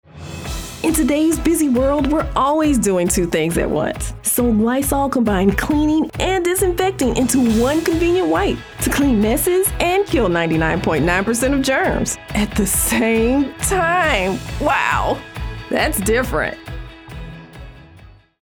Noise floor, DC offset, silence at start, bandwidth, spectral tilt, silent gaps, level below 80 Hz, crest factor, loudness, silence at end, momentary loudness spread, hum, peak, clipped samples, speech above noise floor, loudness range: -44 dBFS; under 0.1%; 0.15 s; over 20 kHz; -4.5 dB/octave; none; -30 dBFS; 16 dB; -17 LUFS; 0.45 s; 8 LU; none; -2 dBFS; under 0.1%; 27 dB; 2 LU